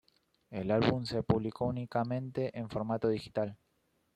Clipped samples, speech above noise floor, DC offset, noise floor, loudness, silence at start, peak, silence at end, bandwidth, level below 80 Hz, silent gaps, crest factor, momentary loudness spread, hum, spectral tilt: under 0.1%; 43 dB; under 0.1%; -76 dBFS; -34 LUFS; 0.5 s; -14 dBFS; 0.6 s; 11.5 kHz; -60 dBFS; none; 20 dB; 8 LU; none; -8 dB/octave